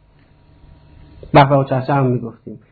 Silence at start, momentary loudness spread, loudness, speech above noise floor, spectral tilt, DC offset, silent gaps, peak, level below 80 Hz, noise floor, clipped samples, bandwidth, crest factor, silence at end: 1.25 s; 18 LU; -15 LUFS; 35 dB; -10.5 dB/octave; under 0.1%; none; 0 dBFS; -44 dBFS; -50 dBFS; under 0.1%; 4.7 kHz; 18 dB; 0.15 s